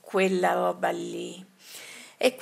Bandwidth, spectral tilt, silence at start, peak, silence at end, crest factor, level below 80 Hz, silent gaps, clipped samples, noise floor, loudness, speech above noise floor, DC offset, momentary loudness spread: 16 kHz; -4.5 dB/octave; 0.05 s; -6 dBFS; 0 s; 22 dB; -80 dBFS; none; under 0.1%; -45 dBFS; -27 LUFS; 19 dB; under 0.1%; 20 LU